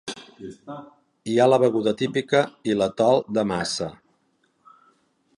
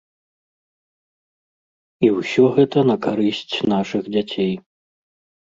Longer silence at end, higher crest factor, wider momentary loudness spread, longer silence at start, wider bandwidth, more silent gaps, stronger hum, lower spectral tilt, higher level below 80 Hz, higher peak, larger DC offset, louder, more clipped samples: first, 1.45 s vs 0.85 s; about the same, 18 dB vs 18 dB; first, 21 LU vs 8 LU; second, 0.05 s vs 2 s; first, 11.5 kHz vs 7.8 kHz; neither; neither; second, -5 dB/octave vs -7 dB/octave; about the same, -62 dBFS vs -60 dBFS; second, -6 dBFS vs -2 dBFS; neither; second, -22 LUFS vs -19 LUFS; neither